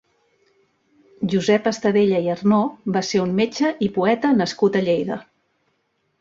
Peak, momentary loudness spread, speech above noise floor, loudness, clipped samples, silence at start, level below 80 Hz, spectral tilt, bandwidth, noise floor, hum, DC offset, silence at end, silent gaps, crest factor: -4 dBFS; 5 LU; 50 dB; -20 LUFS; under 0.1%; 1.2 s; -60 dBFS; -6 dB/octave; 7.8 kHz; -69 dBFS; none; under 0.1%; 1 s; none; 16 dB